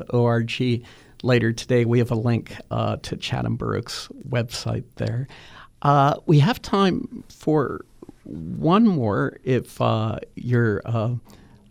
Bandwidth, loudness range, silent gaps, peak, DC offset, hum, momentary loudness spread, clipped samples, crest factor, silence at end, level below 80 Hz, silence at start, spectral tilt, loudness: 14.5 kHz; 5 LU; none; -6 dBFS; under 0.1%; none; 12 LU; under 0.1%; 16 dB; 0.5 s; -50 dBFS; 0 s; -7 dB/octave; -23 LUFS